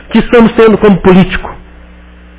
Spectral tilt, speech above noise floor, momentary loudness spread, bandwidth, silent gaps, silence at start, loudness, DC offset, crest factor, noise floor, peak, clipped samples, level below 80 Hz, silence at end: -11.5 dB/octave; 28 dB; 11 LU; 4 kHz; none; 0.1 s; -6 LUFS; under 0.1%; 8 dB; -34 dBFS; 0 dBFS; 3%; -26 dBFS; 0.8 s